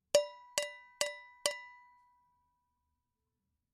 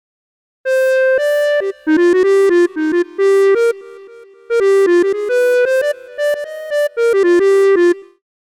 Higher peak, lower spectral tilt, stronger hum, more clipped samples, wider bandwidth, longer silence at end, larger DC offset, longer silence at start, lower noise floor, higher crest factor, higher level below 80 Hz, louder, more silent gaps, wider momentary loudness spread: second, -10 dBFS vs -6 dBFS; second, 0.5 dB/octave vs -3.5 dB/octave; neither; neither; about the same, 15.5 kHz vs 15.5 kHz; first, 2 s vs 0.55 s; neither; second, 0.15 s vs 0.65 s; first, -86 dBFS vs -39 dBFS; first, 30 dB vs 8 dB; second, -82 dBFS vs -62 dBFS; second, -37 LUFS vs -14 LUFS; neither; first, 13 LU vs 8 LU